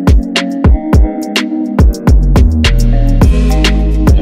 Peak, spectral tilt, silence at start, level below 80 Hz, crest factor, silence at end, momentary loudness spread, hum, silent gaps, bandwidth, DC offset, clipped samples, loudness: 0 dBFS; -6.5 dB/octave; 0 s; -10 dBFS; 8 dB; 0 s; 5 LU; none; none; 15 kHz; under 0.1%; under 0.1%; -11 LUFS